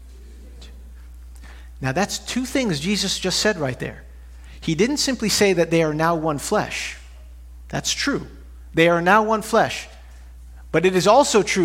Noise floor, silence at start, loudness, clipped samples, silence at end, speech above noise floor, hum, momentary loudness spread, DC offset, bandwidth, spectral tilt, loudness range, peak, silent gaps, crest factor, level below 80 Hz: -41 dBFS; 0 s; -20 LUFS; under 0.1%; 0 s; 21 dB; none; 15 LU; under 0.1%; 16.5 kHz; -4 dB/octave; 4 LU; -2 dBFS; none; 20 dB; -42 dBFS